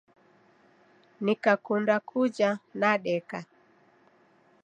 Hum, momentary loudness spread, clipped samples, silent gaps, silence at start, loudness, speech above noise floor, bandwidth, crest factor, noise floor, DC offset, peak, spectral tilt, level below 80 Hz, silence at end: none; 7 LU; under 0.1%; none; 1.2 s; -27 LUFS; 36 dB; 9.4 kHz; 22 dB; -62 dBFS; under 0.1%; -8 dBFS; -6 dB/octave; -82 dBFS; 1.2 s